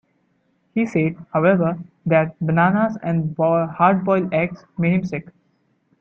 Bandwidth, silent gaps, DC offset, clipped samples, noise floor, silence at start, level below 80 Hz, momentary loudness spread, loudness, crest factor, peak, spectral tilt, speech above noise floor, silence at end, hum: 6.8 kHz; none; under 0.1%; under 0.1%; -65 dBFS; 0.75 s; -58 dBFS; 8 LU; -20 LUFS; 18 dB; -2 dBFS; -9.5 dB/octave; 46 dB; 0.8 s; none